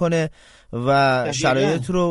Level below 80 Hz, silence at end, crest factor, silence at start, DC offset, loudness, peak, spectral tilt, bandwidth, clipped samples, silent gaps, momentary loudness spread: -48 dBFS; 0 s; 14 dB; 0 s; under 0.1%; -20 LUFS; -4 dBFS; -5.5 dB/octave; 11.5 kHz; under 0.1%; none; 10 LU